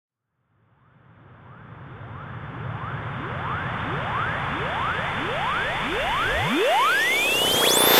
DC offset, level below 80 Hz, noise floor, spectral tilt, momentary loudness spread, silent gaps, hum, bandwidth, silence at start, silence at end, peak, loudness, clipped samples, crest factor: under 0.1%; -46 dBFS; -71 dBFS; -2.5 dB/octave; 18 LU; none; none; 16 kHz; 1.3 s; 0 s; -4 dBFS; -23 LUFS; under 0.1%; 22 dB